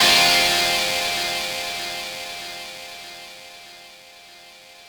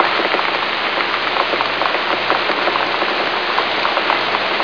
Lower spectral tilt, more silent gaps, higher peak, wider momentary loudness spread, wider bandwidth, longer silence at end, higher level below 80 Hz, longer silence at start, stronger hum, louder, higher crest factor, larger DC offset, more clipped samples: second, 0 dB/octave vs -3.5 dB/octave; neither; second, -4 dBFS vs 0 dBFS; first, 25 LU vs 1 LU; first, over 20 kHz vs 5.4 kHz; about the same, 0 s vs 0 s; about the same, -54 dBFS vs -56 dBFS; about the same, 0 s vs 0 s; neither; second, -19 LUFS vs -16 LUFS; about the same, 18 dB vs 18 dB; second, under 0.1% vs 0.5%; neither